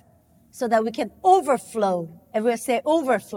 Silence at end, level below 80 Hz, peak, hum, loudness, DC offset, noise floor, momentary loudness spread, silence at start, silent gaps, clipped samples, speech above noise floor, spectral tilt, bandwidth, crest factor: 0 s; -66 dBFS; -4 dBFS; none; -22 LUFS; under 0.1%; -57 dBFS; 10 LU; 0.55 s; none; under 0.1%; 35 dB; -5 dB/octave; 17.5 kHz; 18 dB